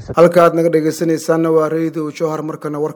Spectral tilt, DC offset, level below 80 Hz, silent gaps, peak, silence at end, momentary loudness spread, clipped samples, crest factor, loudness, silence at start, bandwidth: -6.5 dB/octave; under 0.1%; -52 dBFS; none; 0 dBFS; 0 s; 11 LU; 0.1%; 14 dB; -15 LUFS; 0 s; 19.5 kHz